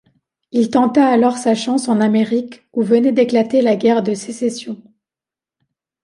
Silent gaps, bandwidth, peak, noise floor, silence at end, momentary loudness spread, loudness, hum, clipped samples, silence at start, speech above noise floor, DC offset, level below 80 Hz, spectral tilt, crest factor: none; 11.5 kHz; -2 dBFS; -89 dBFS; 1.3 s; 9 LU; -16 LUFS; none; under 0.1%; 0.55 s; 74 dB; under 0.1%; -64 dBFS; -5.5 dB/octave; 14 dB